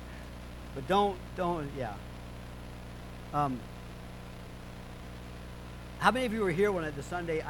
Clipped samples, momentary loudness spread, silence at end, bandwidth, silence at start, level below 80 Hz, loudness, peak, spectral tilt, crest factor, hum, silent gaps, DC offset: under 0.1%; 17 LU; 0 s; 19 kHz; 0 s; -48 dBFS; -32 LUFS; -8 dBFS; -6 dB/octave; 26 dB; 60 Hz at -45 dBFS; none; under 0.1%